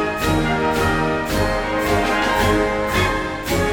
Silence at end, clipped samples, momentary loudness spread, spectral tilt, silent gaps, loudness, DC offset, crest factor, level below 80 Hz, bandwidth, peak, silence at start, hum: 0 s; under 0.1%; 3 LU; -5 dB/octave; none; -19 LUFS; 0.1%; 16 dB; -30 dBFS; 19.5 kHz; -4 dBFS; 0 s; none